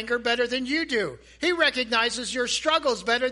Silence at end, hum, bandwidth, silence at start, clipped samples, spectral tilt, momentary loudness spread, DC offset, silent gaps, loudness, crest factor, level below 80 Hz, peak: 0 s; none; 11.5 kHz; 0 s; under 0.1%; -2 dB/octave; 6 LU; under 0.1%; none; -24 LUFS; 18 dB; -56 dBFS; -8 dBFS